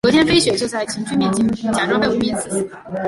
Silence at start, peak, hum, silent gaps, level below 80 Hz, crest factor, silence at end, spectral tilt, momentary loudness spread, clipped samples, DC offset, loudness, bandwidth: 0.05 s; -2 dBFS; none; none; -46 dBFS; 16 dB; 0 s; -4 dB/octave; 10 LU; under 0.1%; under 0.1%; -18 LUFS; 11.5 kHz